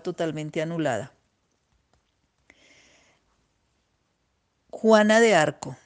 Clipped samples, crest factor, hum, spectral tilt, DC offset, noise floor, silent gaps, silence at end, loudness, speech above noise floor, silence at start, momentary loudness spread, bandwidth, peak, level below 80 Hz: under 0.1%; 22 dB; none; -4.5 dB/octave; under 0.1%; -73 dBFS; none; 0.1 s; -22 LUFS; 51 dB; 0.05 s; 13 LU; 9.8 kHz; -4 dBFS; -70 dBFS